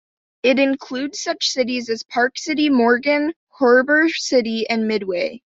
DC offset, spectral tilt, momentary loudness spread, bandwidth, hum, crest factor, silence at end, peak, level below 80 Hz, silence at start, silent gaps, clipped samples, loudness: under 0.1%; -3 dB/octave; 9 LU; 8 kHz; none; 16 dB; 0.15 s; -4 dBFS; -66 dBFS; 0.45 s; 3.36-3.47 s; under 0.1%; -19 LUFS